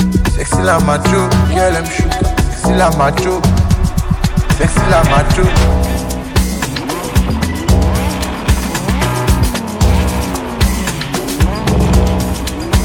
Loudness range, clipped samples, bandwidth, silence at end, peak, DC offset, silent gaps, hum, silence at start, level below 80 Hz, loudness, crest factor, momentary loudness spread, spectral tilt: 3 LU; under 0.1%; 18 kHz; 0 s; 0 dBFS; under 0.1%; none; none; 0 s; -18 dBFS; -14 LUFS; 12 dB; 6 LU; -5.5 dB/octave